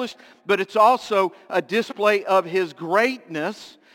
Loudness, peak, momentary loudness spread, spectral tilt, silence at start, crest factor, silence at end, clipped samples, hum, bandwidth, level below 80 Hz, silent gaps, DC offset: -21 LUFS; -4 dBFS; 12 LU; -4.5 dB/octave; 0 s; 18 dB; 0.25 s; under 0.1%; none; 17 kHz; -76 dBFS; none; under 0.1%